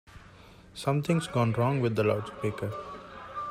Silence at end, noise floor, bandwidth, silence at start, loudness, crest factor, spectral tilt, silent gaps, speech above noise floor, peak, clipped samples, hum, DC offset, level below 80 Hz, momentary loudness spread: 0 s; -52 dBFS; 15 kHz; 0.1 s; -29 LUFS; 18 dB; -7 dB/octave; none; 24 dB; -12 dBFS; under 0.1%; none; under 0.1%; -58 dBFS; 15 LU